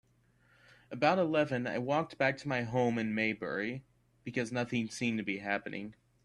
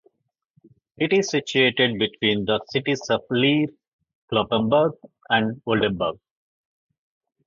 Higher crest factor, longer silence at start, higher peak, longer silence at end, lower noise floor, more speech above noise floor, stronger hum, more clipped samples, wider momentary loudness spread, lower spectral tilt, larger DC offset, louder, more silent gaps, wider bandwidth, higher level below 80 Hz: about the same, 22 dB vs 20 dB; about the same, 0.9 s vs 1 s; second, -12 dBFS vs -4 dBFS; second, 0.35 s vs 1.35 s; about the same, -69 dBFS vs -71 dBFS; second, 36 dB vs 49 dB; neither; neither; first, 13 LU vs 6 LU; about the same, -6 dB/octave vs -5 dB/octave; neither; second, -33 LUFS vs -22 LUFS; second, none vs 3.87-3.99 s, 4.15-4.28 s; first, 11.5 kHz vs 7.6 kHz; second, -70 dBFS vs -56 dBFS